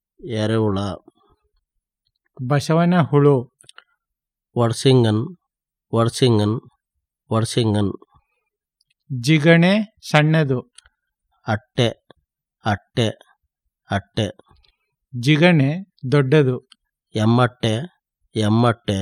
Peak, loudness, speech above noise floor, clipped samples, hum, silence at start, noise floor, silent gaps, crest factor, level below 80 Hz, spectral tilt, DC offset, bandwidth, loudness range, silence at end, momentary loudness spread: 0 dBFS; -19 LUFS; 67 dB; under 0.1%; none; 0.25 s; -85 dBFS; none; 20 dB; -60 dBFS; -6.5 dB/octave; under 0.1%; 13.5 kHz; 6 LU; 0 s; 14 LU